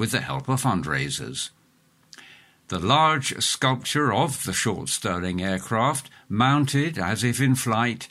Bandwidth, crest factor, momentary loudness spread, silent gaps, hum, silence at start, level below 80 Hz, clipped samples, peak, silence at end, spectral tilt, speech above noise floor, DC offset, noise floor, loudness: 16 kHz; 18 dB; 8 LU; none; none; 0 s; -54 dBFS; under 0.1%; -6 dBFS; 0.05 s; -4 dB/octave; 37 dB; under 0.1%; -61 dBFS; -23 LUFS